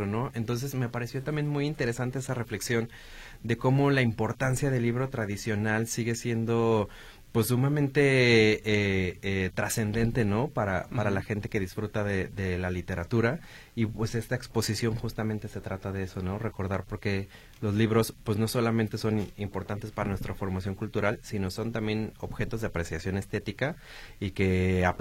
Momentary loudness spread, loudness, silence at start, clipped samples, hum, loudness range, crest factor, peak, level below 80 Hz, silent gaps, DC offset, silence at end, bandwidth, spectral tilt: 9 LU; -29 LUFS; 0 s; under 0.1%; none; 7 LU; 20 dB; -10 dBFS; -48 dBFS; none; under 0.1%; 0 s; 16.5 kHz; -6 dB/octave